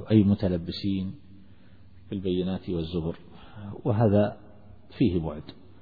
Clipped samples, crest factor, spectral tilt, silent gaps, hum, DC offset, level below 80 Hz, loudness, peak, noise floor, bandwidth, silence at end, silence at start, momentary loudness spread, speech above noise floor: under 0.1%; 20 dB; -10.5 dB/octave; none; none; 0.3%; -50 dBFS; -27 LUFS; -8 dBFS; -54 dBFS; 4.9 kHz; 0.3 s; 0 s; 22 LU; 28 dB